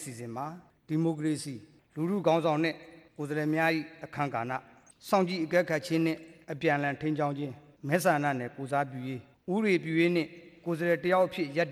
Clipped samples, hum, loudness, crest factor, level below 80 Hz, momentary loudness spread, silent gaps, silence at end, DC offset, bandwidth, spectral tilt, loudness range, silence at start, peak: under 0.1%; none; -30 LUFS; 18 dB; -72 dBFS; 14 LU; none; 0 s; under 0.1%; 15.5 kHz; -6 dB/octave; 1 LU; 0 s; -12 dBFS